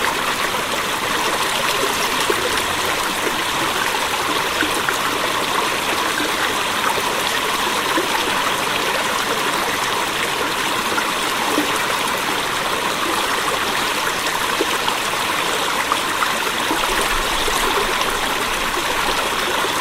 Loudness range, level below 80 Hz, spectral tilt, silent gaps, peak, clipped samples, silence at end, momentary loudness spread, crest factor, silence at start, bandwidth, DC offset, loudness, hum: 1 LU; -40 dBFS; -1.5 dB/octave; none; -2 dBFS; under 0.1%; 0 s; 2 LU; 18 dB; 0 s; 16 kHz; under 0.1%; -18 LUFS; none